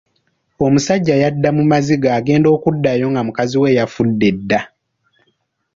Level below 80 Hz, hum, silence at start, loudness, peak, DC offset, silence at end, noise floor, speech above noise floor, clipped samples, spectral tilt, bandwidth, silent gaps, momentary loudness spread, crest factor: -48 dBFS; none; 0.6 s; -15 LUFS; -2 dBFS; under 0.1%; 1.1 s; -66 dBFS; 51 dB; under 0.1%; -6.5 dB/octave; 7.6 kHz; none; 5 LU; 14 dB